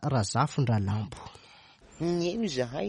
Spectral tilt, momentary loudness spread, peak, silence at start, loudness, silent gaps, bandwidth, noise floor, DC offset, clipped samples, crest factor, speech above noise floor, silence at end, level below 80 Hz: -6 dB/octave; 13 LU; -12 dBFS; 0 s; -29 LUFS; none; 11 kHz; -55 dBFS; under 0.1%; under 0.1%; 18 dB; 26 dB; 0 s; -58 dBFS